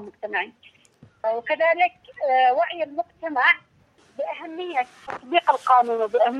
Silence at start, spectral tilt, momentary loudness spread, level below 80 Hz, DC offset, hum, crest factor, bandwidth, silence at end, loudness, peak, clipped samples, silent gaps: 0 s; -3.5 dB/octave; 13 LU; -74 dBFS; under 0.1%; none; 18 dB; 10 kHz; 0 s; -22 LUFS; -4 dBFS; under 0.1%; none